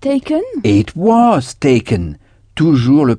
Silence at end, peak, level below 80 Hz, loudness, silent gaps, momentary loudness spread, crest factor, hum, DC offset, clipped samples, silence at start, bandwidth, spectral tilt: 0 s; 0 dBFS; -40 dBFS; -13 LUFS; none; 9 LU; 12 dB; none; under 0.1%; under 0.1%; 0 s; 10 kHz; -7.5 dB/octave